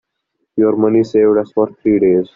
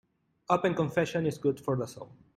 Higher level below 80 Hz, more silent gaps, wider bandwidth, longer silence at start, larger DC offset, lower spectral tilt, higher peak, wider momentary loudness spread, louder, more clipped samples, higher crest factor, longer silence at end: first, -52 dBFS vs -66 dBFS; neither; second, 7 kHz vs 15 kHz; about the same, 0.55 s vs 0.5 s; neither; first, -8 dB/octave vs -6.5 dB/octave; first, -2 dBFS vs -10 dBFS; second, 5 LU vs 8 LU; first, -14 LUFS vs -30 LUFS; neither; second, 12 dB vs 20 dB; about the same, 0.1 s vs 0.2 s